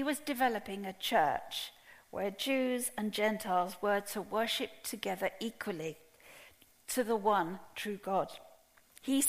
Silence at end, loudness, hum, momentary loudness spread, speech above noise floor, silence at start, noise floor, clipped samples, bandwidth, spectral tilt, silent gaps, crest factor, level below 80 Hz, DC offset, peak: 0 s; -35 LUFS; none; 13 LU; 28 dB; 0 s; -63 dBFS; under 0.1%; 15.5 kHz; -3 dB/octave; none; 18 dB; -70 dBFS; under 0.1%; -16 dBFS